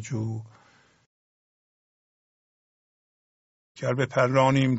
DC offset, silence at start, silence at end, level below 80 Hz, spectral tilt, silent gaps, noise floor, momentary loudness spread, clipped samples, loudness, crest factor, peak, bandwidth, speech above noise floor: under 0.1%; 0 s; 0 s; -64 dBFS; -6 dB/octave; 1.06-3.75 s; under -90 dBFS; 13 LU; under 0.1%; -25 LUFS; 22 dB; -6 dBFS; 8 kHz; over 66 dB